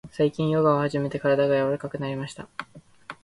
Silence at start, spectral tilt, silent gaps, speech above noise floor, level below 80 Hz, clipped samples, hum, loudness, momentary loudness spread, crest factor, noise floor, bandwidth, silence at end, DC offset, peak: 0.05 s; -7.5 dB/octave; none; 21 dB; -60 dBFS; under 0.1%; none; -24 LUFS; 17 LU; 18 dB; -45 dBFS; 11.5 kHz; 0.1 s; under 0.1%; -8 dBFS